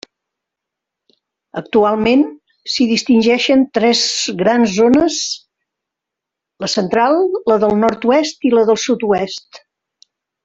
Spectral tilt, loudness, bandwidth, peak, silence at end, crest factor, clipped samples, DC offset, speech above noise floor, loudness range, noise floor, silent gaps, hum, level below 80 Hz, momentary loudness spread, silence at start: -4 dB/octave; -14 LUFS; 8 kHz; -2 dBFS; 0.9 s; 14 dB; under 0.1%; under 0.1%; 68 dB; 3 LU; -82 dBFS; none; none; -52 dBFS; 10 LU; 1.55 s